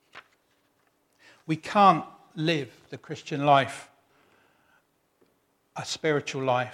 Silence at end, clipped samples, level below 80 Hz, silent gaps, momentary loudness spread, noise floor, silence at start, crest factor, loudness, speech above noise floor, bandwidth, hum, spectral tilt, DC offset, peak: 0 s; under 0.1%; -74 dBFS; none; 22 LU; -70 dBFS; 0.15 s; 22 dB; -25 LUFS; 44 dB; 13.5 kHz; none; -5 dB/octave; under 0.1%; -6 dBFS